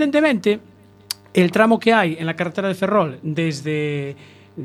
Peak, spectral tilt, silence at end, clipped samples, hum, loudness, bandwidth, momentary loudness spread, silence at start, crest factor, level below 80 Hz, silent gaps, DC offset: -2 dBFS; -6 dB/octave; 0 s; under 0.1%; none; -19 LUFS; 15.5 kHz; 13 LU; 0 s; 16 dB; -64 dBFS; none; under 0.1%